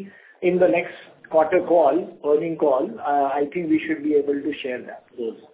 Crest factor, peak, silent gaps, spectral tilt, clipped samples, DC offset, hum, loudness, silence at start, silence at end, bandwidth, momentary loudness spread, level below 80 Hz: 16 dB; -6 dBFS; none; -10 dB/octave; under 0.1%; under 0.1%; none; -22 LUFS; 0 s; 0.15 s; 4 kHz; 14 LU; -64 dBFS